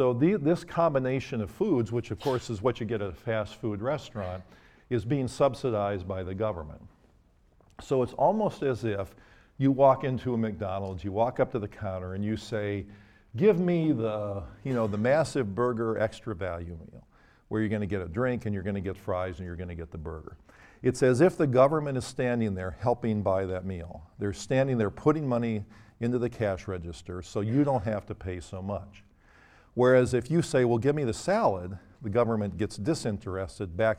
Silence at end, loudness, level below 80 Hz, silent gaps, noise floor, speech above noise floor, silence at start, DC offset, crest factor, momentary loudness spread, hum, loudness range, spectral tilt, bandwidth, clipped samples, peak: 0 s; -29 LUFS; -54 dBFS; none; -62 dBFS; 34 dB; 0 s; under 0.1%; 20 dB; 14 LU; none; 5 LU; -7 dB/octave; 14 kHz; under 0.1%; -8 dBFS